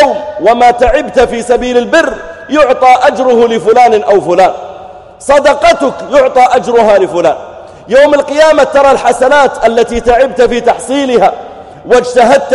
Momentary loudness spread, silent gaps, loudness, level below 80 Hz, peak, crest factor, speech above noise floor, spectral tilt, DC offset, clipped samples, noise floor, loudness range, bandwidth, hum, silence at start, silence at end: 6 LU; none; -8 LUFS; -32 dBFS; 0 dBFS; 8 dB; 22 dB; -4 dB/octave; under 0.1%; 2%; -29 dBFS; 1 LU; 11.5 kHz; none; 0 s; 0 s